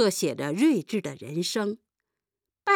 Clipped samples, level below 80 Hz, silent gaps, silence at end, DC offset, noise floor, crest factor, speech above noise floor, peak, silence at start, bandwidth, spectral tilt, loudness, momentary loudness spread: under 0.1%; -78 dBFS; none; 0 s; under 0.1%; -89 dBFS; 16 dB; 63 dB; -10 dBFS; 0 s; 18 kHz; -4.5 dB/octave; -27 LUFS; 10 LU